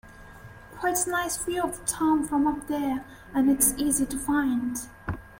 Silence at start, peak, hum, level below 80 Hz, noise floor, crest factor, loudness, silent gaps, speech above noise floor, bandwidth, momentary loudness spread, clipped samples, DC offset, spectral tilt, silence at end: 0.05 s; -8 dBFS; none; -48 dBFS; -46 dBFS; 20 dB; -26 LUFS; none; 20 dB; 16.5 kHz; 12 LU; under 0.1%; under 0.1%; -3.5 dB/octave; 0 s